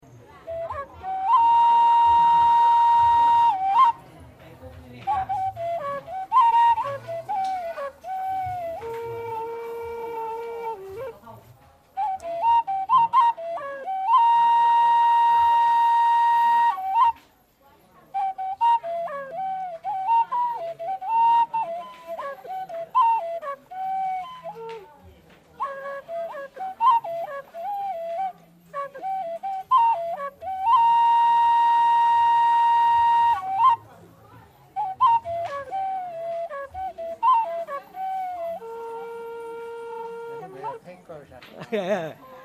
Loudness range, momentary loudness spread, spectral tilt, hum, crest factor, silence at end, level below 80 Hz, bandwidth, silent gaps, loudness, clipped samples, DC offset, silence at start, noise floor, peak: 13 LU; 18 LU; -4 dB/octave; none; 14 dB; 0 s; -62 dBFS; 13.5 kHz; none; -22 LUFS; under 0.1%; under 0.1%; 0.35 s; -58 dBFS; -8 dBFS